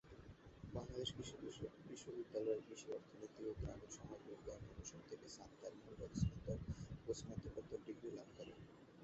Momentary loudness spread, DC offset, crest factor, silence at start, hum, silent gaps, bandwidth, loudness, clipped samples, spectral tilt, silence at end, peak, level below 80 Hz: 13 LU; under 0.1%; 22 dB; 0.05 s; none; none; 8 kHz; -51 LUFS; under 0.1%; -6.5 dB/octave; 0 s; -28 dBFS; -60 dBFS